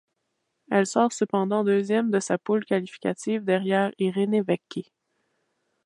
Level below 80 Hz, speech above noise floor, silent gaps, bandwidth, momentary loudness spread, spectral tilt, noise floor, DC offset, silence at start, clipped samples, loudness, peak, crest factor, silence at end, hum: -76 dBFS; 53 dB; none; 11.5 kHz; 6 LU; -5.5 dB/octave; -77 dBFS; under 0.1%; 0.7 s; under 0.1%; -25 LUFS; -6 dBFS; 20 dB; 1.05 s; none